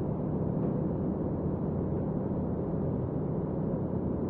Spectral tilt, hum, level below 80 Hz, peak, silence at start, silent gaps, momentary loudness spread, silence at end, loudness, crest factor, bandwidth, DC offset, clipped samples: -12.5 dB/octave; none; -46 dBFS; -18 dBFS; 0 s; none; 2 LU; 0 s; -32 LUFS; 12 dB; 2.9 kHz; under 0.1%; under 0.1%